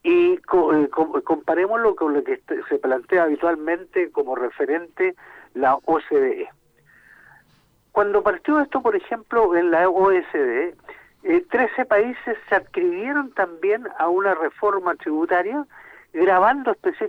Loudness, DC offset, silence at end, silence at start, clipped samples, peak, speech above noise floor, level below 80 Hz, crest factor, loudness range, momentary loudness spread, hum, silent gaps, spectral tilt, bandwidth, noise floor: -21 LUFS; under 0.1%; 0 s; 0.05 s; under 0.1%; -4 dBFS; 39 dB; -60 dBFS; 16 dB; 4 LU; 8 LU; none; none; -7 dB/octave; 4.7 kHz; -60 dBFS